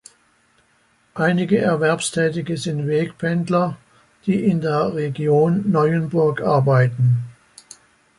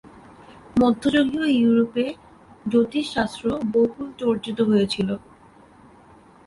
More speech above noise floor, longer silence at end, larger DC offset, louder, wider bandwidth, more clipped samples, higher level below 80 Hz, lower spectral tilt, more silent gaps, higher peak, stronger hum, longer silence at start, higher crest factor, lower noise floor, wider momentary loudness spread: first, 42 dB vs 29 dB; second, 0.9 s vs 1.3 s; neither; first, -19 LUFS vs -22 LUFS; about the same, 11.5 kHz vs 11.5 kHz; neither; about the same, -58 dBFS vs -54 dBFS; about the same, -6.5 dB/octave vs -6 dB/octave; neither; first, -4 dBFS vs -8 dBFS; neither; first, 1.15 s vs 0.5 s; about the same, 16 dB vs 16 dB; first, -60 dBFS vs -50 dBFS; about the same, 7 LU vs 8 LU